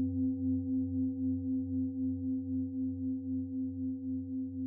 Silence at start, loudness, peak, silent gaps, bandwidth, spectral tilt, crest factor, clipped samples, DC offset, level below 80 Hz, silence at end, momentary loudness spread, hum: 0 s; -35 LUFS; -24 dBFS; none; 0.8 kHz; -15 dB/octave; 10 dB; under 0.1%; under 0.1%; -76 dBFS; 0 s; 5 LU; none